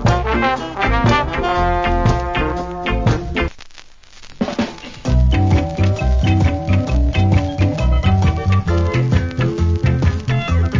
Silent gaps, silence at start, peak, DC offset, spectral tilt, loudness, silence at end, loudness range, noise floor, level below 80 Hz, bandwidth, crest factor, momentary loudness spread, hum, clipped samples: none; 0 s; -2 dBFS; under 0.1%; -7 dB/octave; -17 LUFS; 0 s; 4 LU; -39 dBFS; -20 dBFS; 7.6 kHz; 14 dB; 6 LU; none; under 0.1%